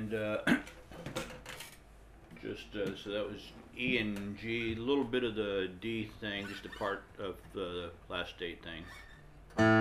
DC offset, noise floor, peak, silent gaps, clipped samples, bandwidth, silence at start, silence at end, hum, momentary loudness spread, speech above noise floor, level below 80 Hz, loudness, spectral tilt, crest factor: under 0.1%; -56 dBFS; -14 dBFS; none; under 0.1%; 15.5 kHz; 0 s; 0 s; none; 16 LU; 19 dB; -58 dBFS; -37 LUFS; -5.5 dB/octave; 22 dB